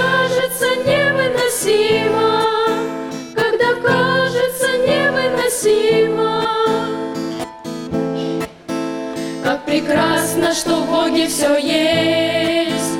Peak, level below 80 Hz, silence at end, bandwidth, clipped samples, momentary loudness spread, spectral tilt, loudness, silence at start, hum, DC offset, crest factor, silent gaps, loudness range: -6 dBFS; -50 dBFS; 0 s; 17 kHz; under 0.1%; 9 LU; -3.5 dB/octave; -17 LUFS; 0 s; none; under 0.1%; 12 dB; none; 5 LU